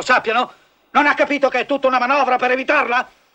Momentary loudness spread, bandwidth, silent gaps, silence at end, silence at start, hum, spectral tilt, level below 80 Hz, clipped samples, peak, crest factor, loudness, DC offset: 5 LU; 9 kHz; none; 0.3 s; 0 s; none; -3 dB/octave; -60 dBFS; under 0.1%; -2 dBFS; 16 dB; -17 LUFS; under 0.1%